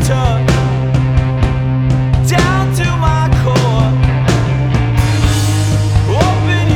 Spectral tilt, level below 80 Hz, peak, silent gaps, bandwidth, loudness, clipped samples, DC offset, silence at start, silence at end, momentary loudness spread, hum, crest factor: -6 dB/octave; -22 dBFS; 0 dBFS; none; 14.5 kHz; -13 LUFS; under 0.1%; under 0.1%; 0 s; 0 s; 2 LU; none; 12 dB